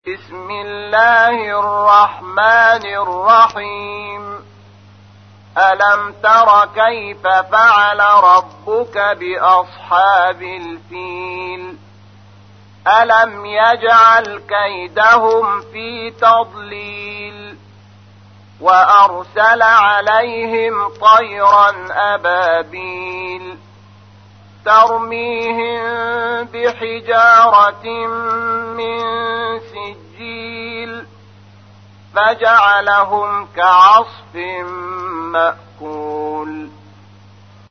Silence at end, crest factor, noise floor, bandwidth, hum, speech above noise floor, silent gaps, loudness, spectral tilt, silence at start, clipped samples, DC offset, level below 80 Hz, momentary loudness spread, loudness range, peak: 1 s; 14 dB; -42 dBFS; 6.6 kHz; none; 30 dB; none; -12 LUFS; -3.5 dB/octave; 0.05 s; under 0.1%; 0.1%; -60 dBFS; 18 LU; 8 LU; 0 dBFS